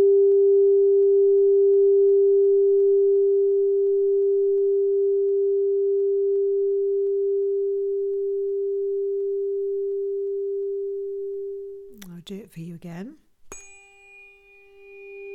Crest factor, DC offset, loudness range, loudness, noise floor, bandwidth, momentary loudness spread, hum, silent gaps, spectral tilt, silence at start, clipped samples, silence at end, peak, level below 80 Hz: 8 dB; under 0.1%; 18 LU; -21 LUFS; -52 dBFS; 8.4 kHz; 20 LU; none; none; -7.5 dB/octave; 0 s; under 0.1%; 0 s; -12 dBFS; -64 dBFS